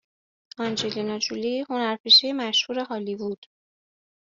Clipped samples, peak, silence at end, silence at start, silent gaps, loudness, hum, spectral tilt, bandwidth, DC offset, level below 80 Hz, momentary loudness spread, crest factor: under 0.1%; -6 dBFS; 0.85 s; 0.6 s; 2.00-2.04 s; -22 LUFS; none; -1 dB/octave; 7.8 kHz; under 0.1%; -72 dBFS; 16 LU; 20 dB